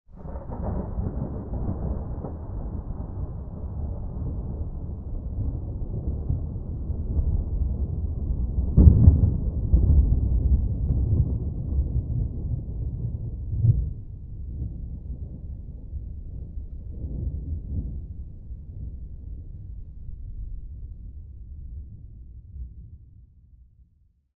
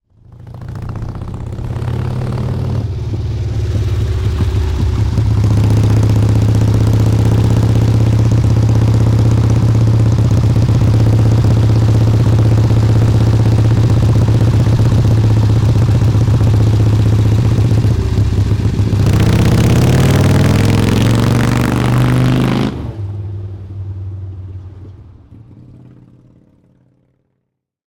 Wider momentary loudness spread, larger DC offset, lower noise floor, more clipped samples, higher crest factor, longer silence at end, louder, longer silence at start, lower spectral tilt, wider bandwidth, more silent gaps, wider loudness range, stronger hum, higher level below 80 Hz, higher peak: first, 18 LU vs 13 LU; neither; second, -62 dBFS vs -71 dBFS; neither; first, 26 dB vs 8 dB; second, 0.55 s vs 2.55 s; second, -27 LUFS vs -12 LUFS; second, 0.1 s vs 0.4 s; first, -16 dB/octave vs -7.5 dB/octave; second, 1.6 kHz vs 13 kHz; neither; first, 20 LU vs 9 LU; neither; about the same, -28 dBFS vs -24 dBFS; first, 0 dBFS vs -4 dBFS